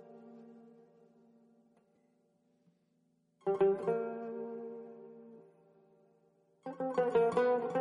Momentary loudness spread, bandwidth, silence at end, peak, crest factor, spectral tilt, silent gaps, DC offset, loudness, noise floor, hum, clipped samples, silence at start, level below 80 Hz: 25 LU; 10 kHz; 0 s; -20 dBFS; 18 dB; -7.5 dB/octave; none; under 0.1%; -34 LUFS; -75 dBFS; none; under 0.1%; 0 s; -80 dBFS